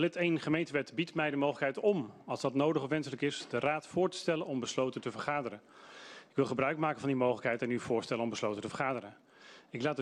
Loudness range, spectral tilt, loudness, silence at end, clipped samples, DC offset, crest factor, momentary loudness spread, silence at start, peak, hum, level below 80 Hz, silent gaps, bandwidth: 2 LU; -5.5 dB/octave; -34 LUFS; 0 s; under 0.1%; under 0.1%; 18 dB; 9 LU; 0 s; -16 dBFS; none; -74 dBFS; none; 11.5 kHz